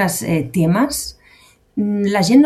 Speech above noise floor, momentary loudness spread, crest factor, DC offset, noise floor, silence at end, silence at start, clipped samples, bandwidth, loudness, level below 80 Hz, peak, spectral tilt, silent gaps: 35 dB; 10 LU; 16 dB; under 0.1%; -50 dBFS; 0 s; 0 s; under 0.1%; 15.5 kHz; -18 LUFS; -46 dBFS; -2 dBFS; -5.5 dB/octave; none